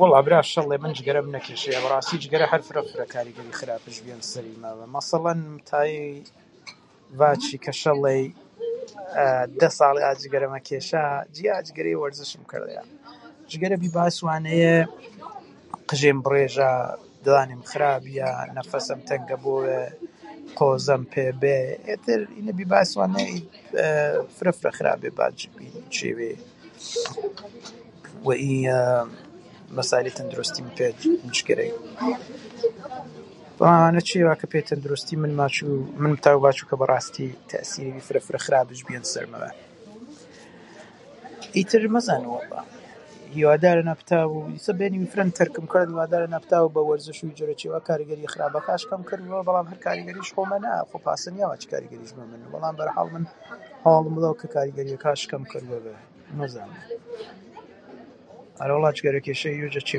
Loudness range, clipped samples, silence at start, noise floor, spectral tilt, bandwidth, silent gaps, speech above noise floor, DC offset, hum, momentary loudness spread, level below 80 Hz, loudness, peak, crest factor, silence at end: 7 LU; under 0.1%; 0 s; -48 dBFS; -5.5 dB/octave; 11.5 kHz; none; 24 dB; under 0.1%; none; 18 LU; -68 dBFS; -24 LUFS; 0 dBFS; 24 dB; 0 s